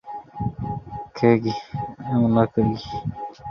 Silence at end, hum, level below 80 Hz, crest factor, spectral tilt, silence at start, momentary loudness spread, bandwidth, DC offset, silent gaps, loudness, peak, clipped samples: 0 s; none; -46 dBFS; 20 dB; -8.5 dB/octave; 0.05 s; 14 LU; 6.6 kHz; under 0.1%; none; -23 LUFS; -4 dBFS; under 0.1%